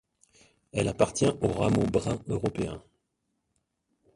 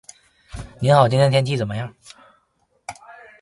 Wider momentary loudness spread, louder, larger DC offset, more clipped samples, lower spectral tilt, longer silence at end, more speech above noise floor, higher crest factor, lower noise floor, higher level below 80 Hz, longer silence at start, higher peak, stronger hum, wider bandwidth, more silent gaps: second, 10 LU vs 24 LU; second, -28 LUFS vs -18 LUFS; neither; neither; about the same, -6 dB/octave vs -6.5 dB/octave; first, 1.35 s vs 0.3 s; first, 52 dB vs 48 dB; about the same, 24 dB vs 22 dB; first, -79 dBFS vs -66 dBFS; about the same, -50 dBFS vs -48 dBFS; first, 0.75 s vs 0.55 s; second, -6 dBFS vs 0 dBFS; neither; about the same, 11.5 kHz vs 11.5 kHz; neither